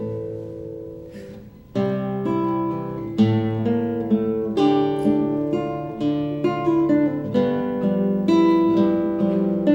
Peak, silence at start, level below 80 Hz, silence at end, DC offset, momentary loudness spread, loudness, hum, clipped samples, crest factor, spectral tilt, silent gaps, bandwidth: -6 dBFS; 0 s; -52 dBFS; 0 s; under 0.1%; 14 LU; -21 LUFS; none; under 0.1%; 16 dB; -9 dB/octave; none; 16 kHz